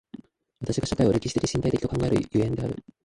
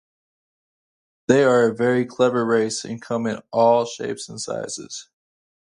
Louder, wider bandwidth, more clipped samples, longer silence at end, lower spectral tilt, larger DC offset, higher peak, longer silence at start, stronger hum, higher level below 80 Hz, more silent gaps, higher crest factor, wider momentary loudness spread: second, -26 LUFS vs -21 LUFS; about the same, 11.5 kHz vs 11 kHz; neither; second, 0.25 s vs 0.75 s; first, -6.5 dB/octave vs -5 dB/octave; neither; second, -10 dBFS vs -2 dBFS; second, 0.15 s vs 1.3 s; neither; first, -44 dBFS vs -66 dBFS; neither; about the same, 16 dB vs 20 dB; second, 8 LU vs 13 LU